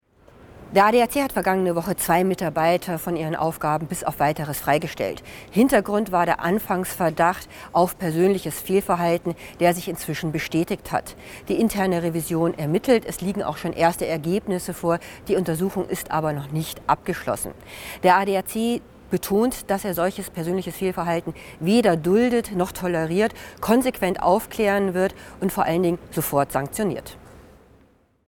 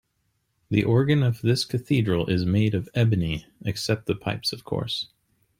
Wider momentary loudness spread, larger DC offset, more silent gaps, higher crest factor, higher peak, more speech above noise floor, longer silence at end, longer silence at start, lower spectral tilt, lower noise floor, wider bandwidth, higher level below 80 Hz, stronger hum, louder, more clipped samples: about the same, 9 LU vs 9 LU; neither; neither; about the same, 20 dB vs 18 dB; about the same, -4 dBFS vs -6 dBFS; second, 36 dB vs 49 dB; first, 0.85 s vs 0.55 s; second, 0.4 s vs 0.7 s; about the same, -5.5 dB/octave vs -6.5 dB/octave; second, -58 dBFS vs -73 dBFS; first, over 20 kHz vs 16 kHz; about the same, -50 dBFS vs -50 dBFS; neither; about the same, -23 LUFS vs -24 LUFS; neither